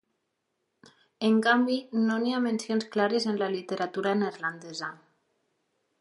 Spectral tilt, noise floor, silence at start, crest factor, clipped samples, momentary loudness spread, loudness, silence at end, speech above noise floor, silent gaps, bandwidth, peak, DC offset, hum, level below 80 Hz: -5 dB/octave; -79 dBFS; 1.2 s; 18 dB; under 0.1%; 11 LU; -28 LUFS; 1.05 s; 52 dB; none; 11.5 kHz; -10 dBFS; under 0.1%; none; -82 dBFS